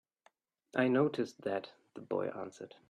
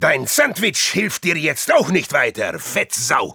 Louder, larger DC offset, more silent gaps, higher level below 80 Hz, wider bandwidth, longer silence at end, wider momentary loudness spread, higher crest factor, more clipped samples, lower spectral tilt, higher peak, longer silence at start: second, -35 LUFS vs -17 LUFS; neither; neither; second, -82 dBFS vs -60 dBFS; second, 10 kHz vs over 20 kHz; first, 0.2 s vs 0 s; first, 17 LU vs 5 LU; about the same, 20 dB vs 16 dB; neither; first, -7 dB/octave vs -2.5 dB/octave; second, -16 dBFS vs -2 dBFS; first, 0.75 s vs 0 s